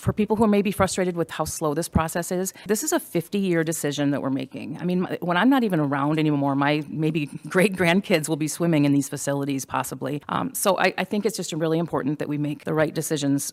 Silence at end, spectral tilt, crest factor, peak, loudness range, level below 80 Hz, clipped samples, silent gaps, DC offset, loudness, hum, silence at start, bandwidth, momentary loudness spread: 0 s; -5 dB/octave; 18 dB; -6 dBFS; 3 LU; -50 dBFS; under 0.1%; none; under 0.1%; -24 LUFS; none; 0 s; 16.5 kHz; 7 LU